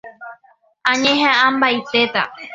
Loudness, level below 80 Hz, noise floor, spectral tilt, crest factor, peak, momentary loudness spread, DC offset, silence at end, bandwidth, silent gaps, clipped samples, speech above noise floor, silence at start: -16 LUFS; -62 dBFS; -55 dBFS; -2.5 dB/octave; 18 dB; 0 dBFS; 8 LU; under 0.1%; 0 s; 7.8 kHz; none; under 0.1%; 38 dB; 0.05 s